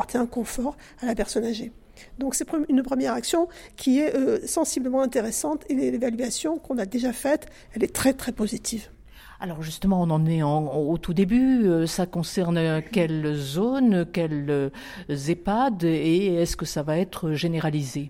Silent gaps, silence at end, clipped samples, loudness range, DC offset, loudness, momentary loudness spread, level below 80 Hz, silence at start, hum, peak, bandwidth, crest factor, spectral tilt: none; 0 s; under 0.1%; 4 LU; under 0.1%; -25 LUFS; 9 LU; -46 dBFS; 0 s; none; -8 dBFS; 16.5 kHz; 16 dB; -5.5 dB/octave